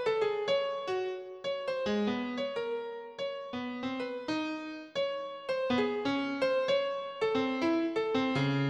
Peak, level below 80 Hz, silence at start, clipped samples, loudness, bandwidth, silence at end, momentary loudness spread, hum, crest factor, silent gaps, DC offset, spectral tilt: -18 dBFS; -70 dBFS; 0 s; under 0.1%; -33 LUFS; 9.6 kHz; 0 s; 8 LU; none; 14 dB; none; under 0.1%; -6 dB/octave